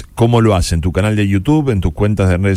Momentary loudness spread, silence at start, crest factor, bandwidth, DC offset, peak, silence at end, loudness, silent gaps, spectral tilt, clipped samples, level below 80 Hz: 4 LU; 0 s; 12 dB; 14.5 kHz; under 0.1%; -2 dBFS; 0 s; -14 LUFS; none; -7 dB/octave; under 0.1%; -26 dBFS